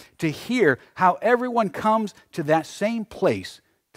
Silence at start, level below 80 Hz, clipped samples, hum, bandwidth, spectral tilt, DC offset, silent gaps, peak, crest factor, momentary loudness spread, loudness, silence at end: 0.2 s; -62 dBFS; under 0.1%; none; 16 kHz; -6 dB/octave; under 0.1%; none; -4 dBFS; 18 dB; 9 LU; -23 LUFS; 0.4 s